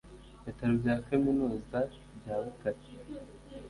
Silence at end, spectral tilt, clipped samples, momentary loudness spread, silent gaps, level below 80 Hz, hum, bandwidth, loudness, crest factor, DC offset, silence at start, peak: 0 s; -8.5 dB/octave; under 0.1%; 18 LU; none; -54 dBFS; none; 11.5 kHz; -33 LUFS; 18 dB; under 0.1%; 0.05 s; -16 dBFS